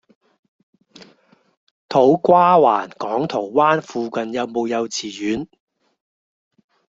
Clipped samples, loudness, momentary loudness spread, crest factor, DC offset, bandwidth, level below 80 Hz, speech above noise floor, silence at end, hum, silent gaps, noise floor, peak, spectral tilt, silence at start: under 0.1%; -18 LUFS; 12 LU; 18 dB; under 0.1%; 7.8 kHz; -62 dBFS; 38 dB; 1.55 s; none; none; -55 dBFS; -2 dBFS; -5.5 dB/octave; 1.9 s